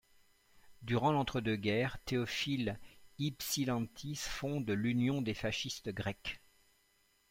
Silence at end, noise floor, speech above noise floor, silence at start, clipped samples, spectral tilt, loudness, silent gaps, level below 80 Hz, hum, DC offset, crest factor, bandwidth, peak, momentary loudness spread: 0.95 s; -73 dBFS; 37 dB; 0.65 s; under 0.1%; -5 dB/octave; -36 LUFS; none; -60 dBFS; none; under 0.1%; 18 dB; 16.5 kHz; -20 dBFS; 8 LU